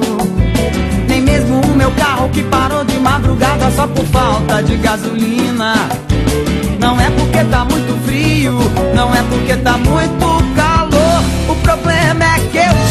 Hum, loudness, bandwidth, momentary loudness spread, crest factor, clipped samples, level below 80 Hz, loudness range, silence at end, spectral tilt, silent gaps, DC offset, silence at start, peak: none; -12 LUFS; 13 kHz; 4 LU; 10 dB; under 0.1%; -20 dBFS; 2 LU; 0 s; -5.5 dB/octave; none; under 0.1%; 0 s; 0 dBFS